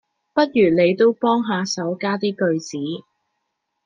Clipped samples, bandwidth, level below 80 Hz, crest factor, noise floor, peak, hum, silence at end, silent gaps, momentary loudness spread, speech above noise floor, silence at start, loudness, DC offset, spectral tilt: under 0.1%; 9.2 kHz; -64 dBFS; 18 dB; -76 dBFS; -4 dBFS; none; 0.85 s; none; 12 LU; 57 dB; 0.35 s; -20 LUFS; under 0.1%; -5.5 dB/octave